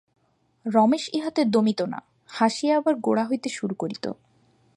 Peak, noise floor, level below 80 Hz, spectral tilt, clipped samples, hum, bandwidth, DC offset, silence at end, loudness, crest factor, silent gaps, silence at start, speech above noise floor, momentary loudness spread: -6 dBFS; -62 dBFS; -74 dBFS; -5.5 dB/octave; under 0.1%; none; 11 kHz; under 0.1%; 0.65 s; -24 LUFS; 18 dB; none; 0.65 s; 39 dB; 14 LU